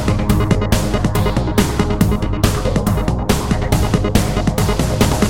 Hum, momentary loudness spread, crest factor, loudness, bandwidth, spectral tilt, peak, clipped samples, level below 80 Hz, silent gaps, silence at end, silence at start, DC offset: none; 2 LU; 16 dB; -17 LUFS; 17 kHz; -6 dB/octave; 0 dBFS; under 0.1%; -22 dBFS; none; 0 s; 0 s; 2%